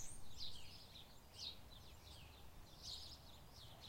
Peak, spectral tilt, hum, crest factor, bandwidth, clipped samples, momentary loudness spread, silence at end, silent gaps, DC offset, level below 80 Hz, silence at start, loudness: -34 dBFS; -2.5 dB/octave; none; 18 dB; 16.5 kHz; under 0.1%; 9 LU; 0 s; none; under 0.1%; -64 dBFS; 0 s; -55 LUFS